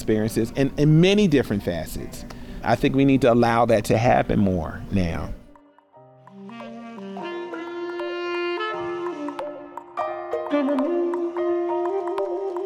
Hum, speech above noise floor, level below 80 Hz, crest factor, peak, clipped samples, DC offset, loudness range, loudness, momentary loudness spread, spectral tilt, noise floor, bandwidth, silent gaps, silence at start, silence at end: none; 32 dB; -42 dBFS; 16 dB; -8 dBFS; under 0.1%; under 0.1%; 11 LU; -23 LUFS; 19 LU; -7 dB/octave; -52 dBFS; 17 kHz; none; 0 s; 0 s